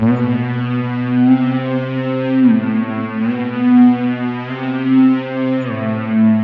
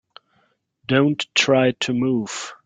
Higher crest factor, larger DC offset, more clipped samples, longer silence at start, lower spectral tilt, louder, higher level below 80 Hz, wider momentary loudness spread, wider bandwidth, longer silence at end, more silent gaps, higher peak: second, 12 dB vs 18 dB; neither; neither; second, 0 s vs 0.9 s; first, -10 dB/octave vs -4.5 dB/octave; first, -15 LUFS vs -19 LUFS; first, -56 dBFS vs -62 dBFS; about the same, 8 LU vs 9 LU; second, 4.7 kHz vs 9.4 kHz; about the same, 0 s vs 0.1 s; neither; about the same, -2 dBFS vs -4 dBFS